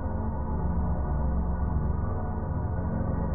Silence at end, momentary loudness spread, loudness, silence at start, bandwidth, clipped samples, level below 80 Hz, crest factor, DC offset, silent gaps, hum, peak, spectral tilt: 0 s; 3 LU; -30 LUFS; 0 s; 2.3 kHz; under 0.1%; -30 dBFS; 12 dB; under 0.1%; none; none; -16 dBFS; -8 dB/octave